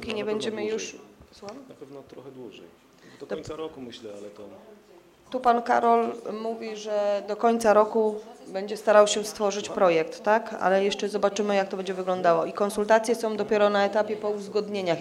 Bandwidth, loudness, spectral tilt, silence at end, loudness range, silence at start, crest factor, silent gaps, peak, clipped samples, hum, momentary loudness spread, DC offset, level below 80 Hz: 14.5 kHz; -25 LUFS; -4 dB/octave; 0 s; 17 LU; 0 s; 22 dB; none; -4 dBFS; under 0.1%; none; 22 LU; under 0.1%; -66 dBFS